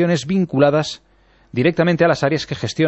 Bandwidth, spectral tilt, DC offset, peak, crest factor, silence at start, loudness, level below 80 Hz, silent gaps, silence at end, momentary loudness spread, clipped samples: 8.4 kHz; -6 dB/octave; under 0.1%; -2 dBFS; 16 dB; 0 s; -18 LUFS; -52 dBFS; none; 0 s; 11 LU; under 0.1%